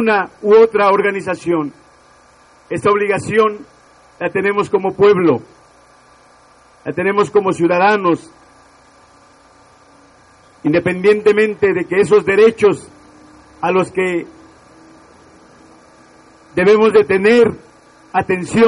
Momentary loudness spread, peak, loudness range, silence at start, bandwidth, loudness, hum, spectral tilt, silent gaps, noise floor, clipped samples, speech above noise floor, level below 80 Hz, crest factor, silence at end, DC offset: 12 LU; 0 dBFS; 6 LU; 0 s; 10.5 kHz; -14 LUFS; none; -6 dB/octave; none; -48 dBFS; under 0.1%; 34 dB; -54 dBFS; 16 dB; 0 s; under 0.1%